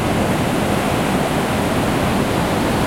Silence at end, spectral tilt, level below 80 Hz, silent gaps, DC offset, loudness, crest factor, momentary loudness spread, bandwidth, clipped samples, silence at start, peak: 0 s; -5.5 dB/octave; -34 dBFS; none; under 0.1%; -18 LUFS; 12 dB; 1 LU; 16.5 kHz; under 0.1%; 0 s; -4 dBFS